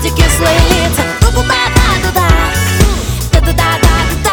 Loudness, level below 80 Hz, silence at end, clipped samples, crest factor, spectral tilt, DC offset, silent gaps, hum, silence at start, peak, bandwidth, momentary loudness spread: -11 LUFS; -14 dBFS; 0 s; 0.2%; 10 dB; -4 dB/octave; under 0.1%; none; none; 0 s; 0 dBFS; 19 kHz; 3 LU